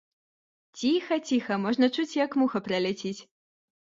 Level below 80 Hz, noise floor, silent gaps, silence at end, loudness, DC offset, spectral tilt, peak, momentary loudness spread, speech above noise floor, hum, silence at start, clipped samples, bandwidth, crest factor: -72 dBFS; under -90 dBFS; none; 0.65 s; -27 LUFS; under 0.1%; -5 dB/octave; -12 dBFS; 7 LU; over 63 dB; none; 0.75 s; under 0.1%; 7.8 kHz; 18 dB